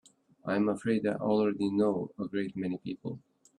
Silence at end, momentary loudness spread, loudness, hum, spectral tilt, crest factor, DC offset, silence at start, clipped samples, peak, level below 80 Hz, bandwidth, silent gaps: 0.4 s; 12 LU; -31 LUFS; none; -7.5 dB/octave; 16 dB; under 0.1%; 0.45 s; under 0.1%; -16 dBFS; -72 dBFS; 10.5 kHz; none